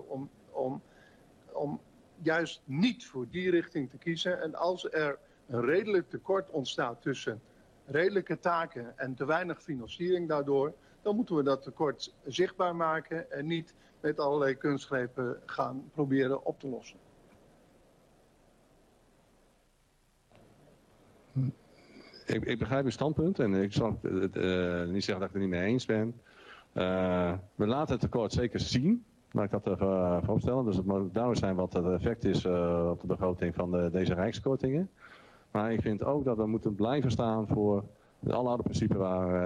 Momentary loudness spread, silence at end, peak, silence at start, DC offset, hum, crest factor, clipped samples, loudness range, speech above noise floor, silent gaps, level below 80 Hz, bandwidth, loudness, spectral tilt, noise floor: 8 LU; 0 s; -16 dBFS; 0 s; under 0.1%; none; 16 dB; under 0.1%; 5 LU; 37 dB; none; -56 dBFS; 10 kHz; -32 LUFS; -7 dB/octave; -68 dBFS